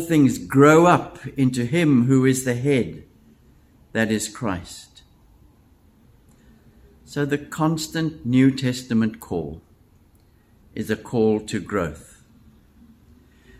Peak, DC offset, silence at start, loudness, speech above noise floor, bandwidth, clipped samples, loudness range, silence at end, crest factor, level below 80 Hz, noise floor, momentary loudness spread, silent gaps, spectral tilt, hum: -2 dBFS; under 0.1%; 0 s; -21 LUFS; 36 dB; 15.5 kHz; under 0.1%; 11 LU; 1.6 s; 20 dB; -52 dBFS; -56 dBFS; 16 LU; none; -6 dB/octave; none